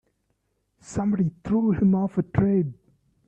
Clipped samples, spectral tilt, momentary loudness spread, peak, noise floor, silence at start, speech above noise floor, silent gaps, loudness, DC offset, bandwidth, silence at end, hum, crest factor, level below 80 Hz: under 0.1%; -9 dB/octave; 7 LU; -6 dBFS; -73 dBFS; 0.9 s; 50 dB; none; -24 LUFS; under 0.1%; 8.4 kHz; 0.55 s; none; 18 dB; -50 dBFS